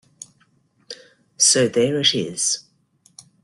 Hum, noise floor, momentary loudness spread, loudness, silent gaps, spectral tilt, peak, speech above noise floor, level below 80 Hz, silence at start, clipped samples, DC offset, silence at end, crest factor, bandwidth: none; -61 dBFS; 24 LU; -18 LUFS; none; -2 dB/octave; -2 dBFS; 42 dB; -64 dBFS; 0.9 s; under 0.1%; under 0.1%; 0.85 s; 20 dB; 12.5 kHz